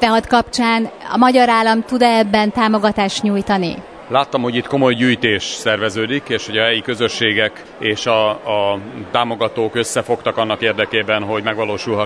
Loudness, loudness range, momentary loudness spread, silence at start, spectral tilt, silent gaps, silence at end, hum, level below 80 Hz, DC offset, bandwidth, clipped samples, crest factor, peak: -16 LUFS; 4 LU; 7 LU; 0 s; -4.5 dB/octave; none; 0 s; none; -48 dBFS; under 0.1%; 11 kHz; under 0.1%; 16 dB; 0 dBFS